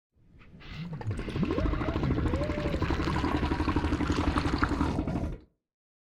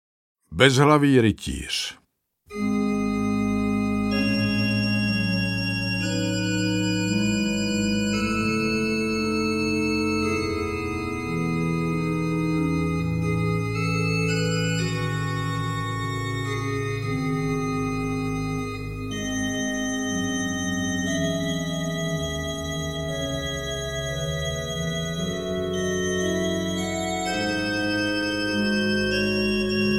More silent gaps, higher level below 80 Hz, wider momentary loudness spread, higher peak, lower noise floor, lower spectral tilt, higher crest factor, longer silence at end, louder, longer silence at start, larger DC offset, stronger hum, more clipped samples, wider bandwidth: neither; first, -36 dBFS vs -44 dBFS; first, 10 LU vs 5 LU; second, -10 dBFS vs 0 dBFS; second, -54 dBFS vs -65 dBFS; first, -7 dB/octave vs -5 dB/octave; about the same, 20 dB vs 24 dB; first, 0.65 s vs 0 s; second, -30 LUFS vs -24 LUFS; second, 0.35 s vs 0.5 s; second, under 0.1% vs 0.2%; neither; neither; second, 11.5 kHz vs 16 kHz